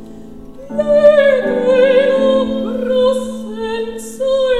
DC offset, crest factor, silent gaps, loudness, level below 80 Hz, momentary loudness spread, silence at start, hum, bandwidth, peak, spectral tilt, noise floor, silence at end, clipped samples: 1%; 14 dB; none; -14 LUFS; -42 dBFS; 14 LU; 0 s; none; 12.5 kHz; 0 dBFS; -5 dB/octave; -34 dBFS; 0 s; under 0.1%